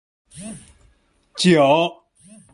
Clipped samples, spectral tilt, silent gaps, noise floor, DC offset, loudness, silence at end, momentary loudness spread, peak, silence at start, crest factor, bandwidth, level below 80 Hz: under 0.1%; -5 dB/octave; none; -59 dBFS; under 0.1%; -17 LUFS; 0.6 s; 23 LU; -2 dBFS; 0.35 s; 18 dB; 11.5 kHz; -58 dBFS